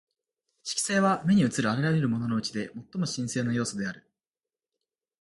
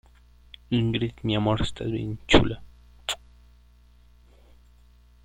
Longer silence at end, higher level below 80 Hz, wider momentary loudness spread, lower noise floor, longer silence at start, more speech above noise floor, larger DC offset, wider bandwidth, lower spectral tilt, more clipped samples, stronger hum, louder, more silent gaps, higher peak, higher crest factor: second, 1.25 s vs 2.1 s; second, -64 dBFS vs -40 dBFS; about the same, 12 LU vs 13 LU; first, under -90 dBFS vs -55 dBFS; about the same, 0.65 s vs 0.7 s; first, over 63 dB vs 31 dB; neither; second, 11.5 kHz vs 16 kHz; about the same, -5 dB/octave vs -5.5 dB/octave; neither; second, none vs 60 Hz at -50 dBFS; about the same, -28 LUFS vs -26 LUFS; neither; second, -12 dBFS vs -2 dBFS; second, 18 dB vs 26 dB